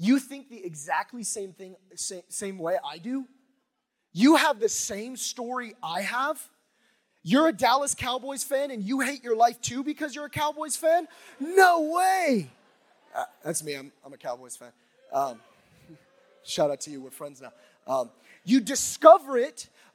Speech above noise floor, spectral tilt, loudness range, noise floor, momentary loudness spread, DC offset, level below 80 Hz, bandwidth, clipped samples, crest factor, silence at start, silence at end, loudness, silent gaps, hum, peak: 53 dB; -3.5 dB/octave; 10 LU; -79 dBFS; 20 LU; under 0.1%; -68 dBFS; 17.5 kHz; under 0.1%; 24 dB; 0 s; 0.3 s; -25 LUFS; none; none; -2 dBFS